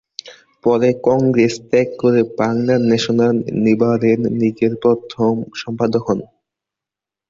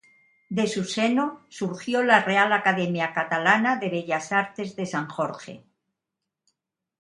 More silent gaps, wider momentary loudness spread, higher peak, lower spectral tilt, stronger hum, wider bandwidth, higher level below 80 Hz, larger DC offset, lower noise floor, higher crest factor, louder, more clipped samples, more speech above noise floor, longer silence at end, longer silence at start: neither; second, 7 LU vs 12 LU; about the same, -2 dBFS vs -2 dBFS; first, -7 dB/octave vs -4.5 dB/octave; neither; second, 7.6 kHz vs 11.5 kHz; first, -54 dBFS vs -72 dBFS; neither; about the same, -87 dBFS vs -85 dBFS; second, 14 dB vs 22 dB; first, -16 LUFS vs -24 LUFS; neither; first, 71 dB vs 61 dB; second, 1.05 s vs 1.45 s; second, 0.25 s vs 0.5 s